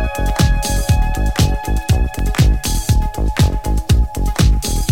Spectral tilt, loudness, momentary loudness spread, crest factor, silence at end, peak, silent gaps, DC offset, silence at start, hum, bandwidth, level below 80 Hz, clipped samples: -5 dB/octave; -17 LUFS; 4 LU; 14 dB; 0 s; 0 dBFS; none; 2%; 0 s; none; 17 kHz; -16 dBFS; under 0.1%